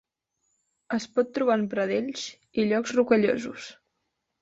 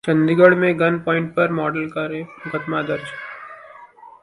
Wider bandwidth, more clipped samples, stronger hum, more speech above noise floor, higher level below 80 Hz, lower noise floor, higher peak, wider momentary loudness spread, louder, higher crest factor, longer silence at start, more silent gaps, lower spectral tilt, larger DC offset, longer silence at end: second, 8 kHz vs 11 kHz; neither; neither; first, 54 dB vs 25 dB; second, -68 dBFS vs -60 dBFS; first, -79 dBFS vs -43 dBFS; second, -8 dBFS vs 0 dBFS; second, 13 LU vs 20 LU; second, -26 LUFS vs -19 LUFS; about the same, 18 dB vs 20 dB; first, 0.9 s vs 0.05 s; neither; second, -5 dB/octave vs -8 dB/octave; neither; first, 0.7 s vs 0.15 s